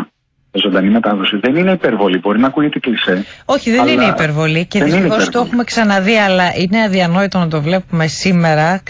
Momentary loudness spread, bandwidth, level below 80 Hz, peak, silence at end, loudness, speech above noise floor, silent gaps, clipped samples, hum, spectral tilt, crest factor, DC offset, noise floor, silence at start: 5 LU; 8 kHz; -46 dBFS; -2 dBFS; 0.1 s; -13 LUFS; 39 dB; none; under 0.1%; none; -5.5 dB/octave; 12 dB; under 0.1%; -52 dBFS; 0 s